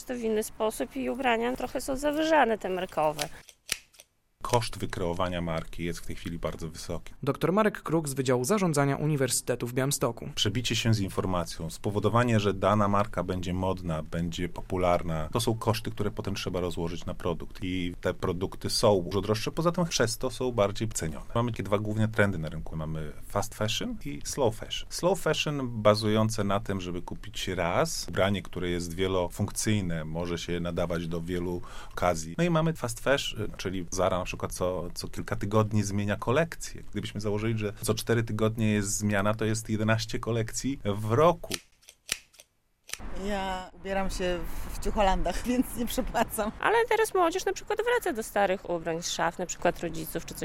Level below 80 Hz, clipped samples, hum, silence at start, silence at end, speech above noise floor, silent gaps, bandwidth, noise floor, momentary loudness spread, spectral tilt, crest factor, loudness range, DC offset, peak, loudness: -44 dBFS; under 0.1%; none; 0 s; 0 s; 32 dB; none; 16.5 kHz; -60 dBFS; 10 LU; -5 dB/octave; 22 dB; 4 LU; under 0.1%; -6 dBFS; -29 LUFS